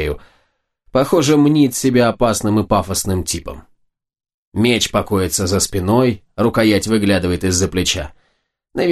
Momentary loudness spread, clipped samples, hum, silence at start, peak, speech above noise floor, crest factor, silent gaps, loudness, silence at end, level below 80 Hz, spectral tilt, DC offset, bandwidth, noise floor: 10 LU; under 0.1%; none; 0 s; 0 dBFS; 50 dB; 16 dB; 4.34-4.52 s; -16 LUFS; 0 s; -38 dBFS; -4.5 dB/octave; under 0.1%; 13 kHz; -66 dBFS